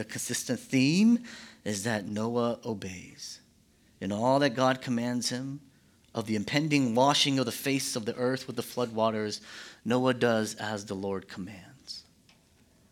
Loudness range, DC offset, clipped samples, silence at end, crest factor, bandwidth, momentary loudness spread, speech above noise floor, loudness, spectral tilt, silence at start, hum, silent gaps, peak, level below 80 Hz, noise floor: 4 LU; under 0.1%; under 0.1%; 0.9 s; 20 dB; 17.5 kHz; 18 LU; 34 dB; -29 LUFS; -4.5 dB/octave; 0 s; none; none; -10 dBFS; -70 dBFS; -63 dBFS